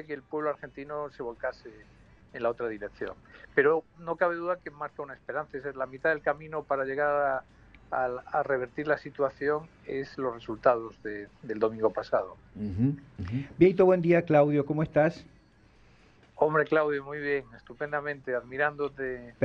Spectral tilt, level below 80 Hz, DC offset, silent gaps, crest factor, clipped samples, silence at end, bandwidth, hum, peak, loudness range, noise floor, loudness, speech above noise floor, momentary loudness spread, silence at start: -8.5 dB/octave; -60 dBFS; under 0.1%; none; 22 dB; under 0.1%; 0 s; 7 kHz; none; -8 dBFS; 6 LU; -59 dBFS; -29 LUFS; 30 dB; 15 LU; 0 s